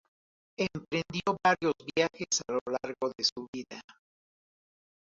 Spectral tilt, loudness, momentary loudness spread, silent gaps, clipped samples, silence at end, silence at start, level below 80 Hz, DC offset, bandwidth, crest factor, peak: -3 dB/octave; -31 LUFS; 15 LU; 2.61-2.66 s, 3.32-3.36 s, 3.48-3.53 s; under 0.1%; 1.25 s; 0.6 s; -68 dBFS; under 0.1%; 7.8 kHz; 22 dB; -10 dBFS